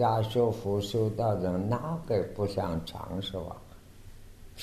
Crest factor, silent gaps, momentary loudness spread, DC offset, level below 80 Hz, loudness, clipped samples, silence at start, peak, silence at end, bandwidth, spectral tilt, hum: 16 dB; none; 11 LU; under 0.1%; -52 dBFS; -31 LUFS; under 0.1%; 0 s; -14 dBFS; 0 s; 13.5 kHz; -7 dB/octave; none